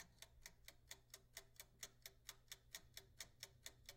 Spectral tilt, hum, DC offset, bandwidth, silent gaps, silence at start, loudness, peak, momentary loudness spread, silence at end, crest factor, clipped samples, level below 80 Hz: -0.5 dB/octave; none; under 0.1%; 16.5 kHz; none; 0 s; -59 LUFS; -34 dBFS; 5 LU; 0 s; 28 dB; under 0.1%; -74 dBFS